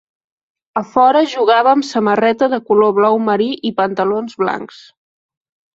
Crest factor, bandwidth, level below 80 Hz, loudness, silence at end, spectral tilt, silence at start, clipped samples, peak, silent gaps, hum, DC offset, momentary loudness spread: 14 dB; 7.8 kHz; -62 dBFS; -14 LUFS; 1.1 s; -5.5 dB/octave; 0.75 s; under 0.1%; -2 dBFS; none; none; under 0.1%; 8 LU